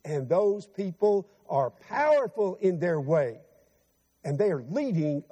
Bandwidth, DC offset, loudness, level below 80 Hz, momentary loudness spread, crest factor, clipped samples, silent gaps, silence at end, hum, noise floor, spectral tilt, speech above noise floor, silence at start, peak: 9 kHz; under 0.1%; -27 LUFS; -74 dBFS; 8 LU; 14 dB; under 0.1%; none; 0.1 s; none; -69 dBFS; -8 dB/octave; 43 dB; 0.05 s; -14 dBFS